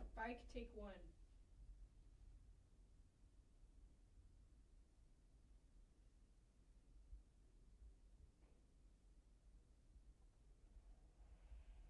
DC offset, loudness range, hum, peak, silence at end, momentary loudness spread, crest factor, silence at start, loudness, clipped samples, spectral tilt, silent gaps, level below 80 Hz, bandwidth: under 0.1%; 8 LU; none; -38 dBFS; 0 s; 18 LU; 24 dB; 0 s; -58 LUFS; under 0.1%; -6 dB/octave; none; -66 dBFS; 10 kHz